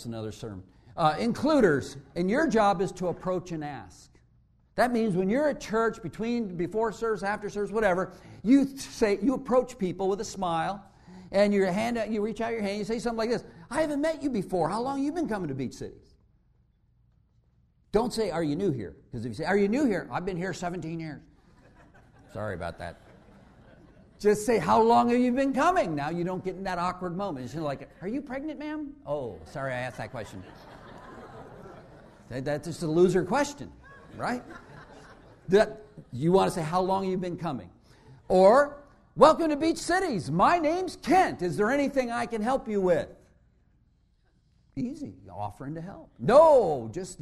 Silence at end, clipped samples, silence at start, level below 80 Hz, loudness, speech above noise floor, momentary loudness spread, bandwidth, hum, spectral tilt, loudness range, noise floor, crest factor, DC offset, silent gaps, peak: 0.05 s; under 0.1%; 0 s; -54 dBFS; -27 LUFS; 39 dB; 18 LU; 13.5 kHz; none; -6 dB/octave; 11 LU; -66 dBFS; 24 dB; under 0.1%; none; -4 dBFS